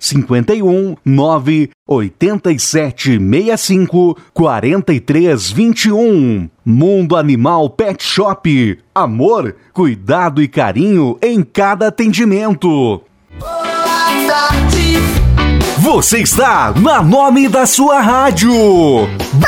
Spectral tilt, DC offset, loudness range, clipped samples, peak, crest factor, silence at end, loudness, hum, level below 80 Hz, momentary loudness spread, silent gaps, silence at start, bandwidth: -5 dB/octave; under 0.1%; 4 LU; under 0.1%; 0 dBFS; 10 dB; 0 s; -11 LUFS; none; -26 dBFS; 6 LU; 1.74-1.86 s; 0 s; 16.5 kHz